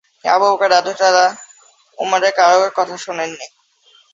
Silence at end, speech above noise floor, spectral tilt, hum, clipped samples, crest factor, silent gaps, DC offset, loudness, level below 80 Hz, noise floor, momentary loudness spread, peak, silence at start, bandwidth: 0.65 s; 38 dB; -1.5 dB/octave; none; under 0.1%; 16 dB; none; under 0.1%; -15 LUFS; -68 dBFS; -53 dBFS; 13 LU; 0 dBFS; 0.25 s; 7.8 kHz